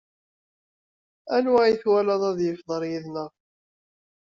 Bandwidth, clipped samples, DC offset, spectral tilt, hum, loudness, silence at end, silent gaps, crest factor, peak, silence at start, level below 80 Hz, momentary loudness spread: 7.4 kHz; under 0.1%; under 0.1%; -4.5 dB/octave; none; -23 LUFS; 0.95 s; none; 18 dB; -8 dBFS; 1.25 s; -68 dBFS; 14 LU